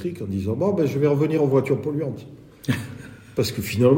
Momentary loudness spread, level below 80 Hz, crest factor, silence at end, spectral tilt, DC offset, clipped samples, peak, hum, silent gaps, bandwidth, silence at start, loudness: 12 LU; -56 dBFS; 18 dB; 0 s; -7 dB/octave; under 0.1%; under 0.1%; -4 dBFS; none; none; 16.5 kHz; 0 s; -23 LUFS